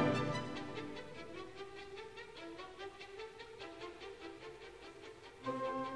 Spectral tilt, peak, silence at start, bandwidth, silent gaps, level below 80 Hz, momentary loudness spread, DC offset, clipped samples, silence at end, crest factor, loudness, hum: -6 dB/octave; -20 dBFS; 0 s; 11 kHz; none; -70 dBFS; 12 LU; under 0.1%; under 0.1%; 0 s; 24 dB; -46 LUFS; none